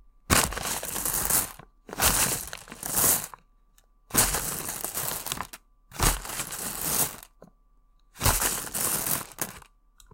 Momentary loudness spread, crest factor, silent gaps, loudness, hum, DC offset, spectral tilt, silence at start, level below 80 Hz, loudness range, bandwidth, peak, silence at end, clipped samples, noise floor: 13 LU; 26 dB; none; -26 LUFS; none; under 0.1%; -1.5 dB/octave; 0.3 s; -42 dBFS; 4 LU; 17 kHz; -2 dBFS; 0.55 s; under 0.1%; -61 dBFS